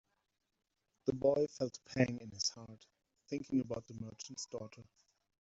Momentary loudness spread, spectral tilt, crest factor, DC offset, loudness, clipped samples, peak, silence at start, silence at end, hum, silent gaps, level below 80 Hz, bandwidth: 16 LU; -5 dB/octave; 24 dB; under 0.1%; -38 LUFS; under 0.1%; -16 dBFS; 1.05 s; 0.6 s; none; none; -72 dBFS; 8 kHz